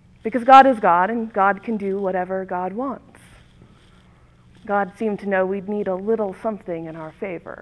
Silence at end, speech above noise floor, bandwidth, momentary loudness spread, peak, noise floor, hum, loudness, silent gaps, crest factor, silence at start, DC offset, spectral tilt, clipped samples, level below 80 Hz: 0.05 s; 32 dB; 11 kHz; 19 LU; 0 dBFS; -51 dBFS; none; -20 LUFS; none; 20 dB; 0.25 s; under 0.1%; -7 dB/octave; under 0.1%; -56 dBFS